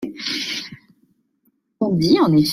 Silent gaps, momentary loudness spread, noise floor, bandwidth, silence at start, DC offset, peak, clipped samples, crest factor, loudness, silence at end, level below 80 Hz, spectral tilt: none; 13 LU; -66 dBFS; 16 kHz; 0 s; under 0.1%; -4 dBFS; under 0.1%; 16 dB; -19 LUFS; 0 s; -56 dBFS; -5.5 dB/octave